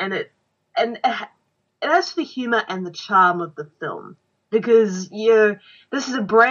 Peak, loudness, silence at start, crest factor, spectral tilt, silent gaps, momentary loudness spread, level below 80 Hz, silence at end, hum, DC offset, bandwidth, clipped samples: -2 dBFS; -20 LUFS; 0 s; 20 dB; -4.5 dB/octave; none; 15 LU; -74 dBFS; 0 s; none; under 0.1%; 7.2 kHz; under 0.1%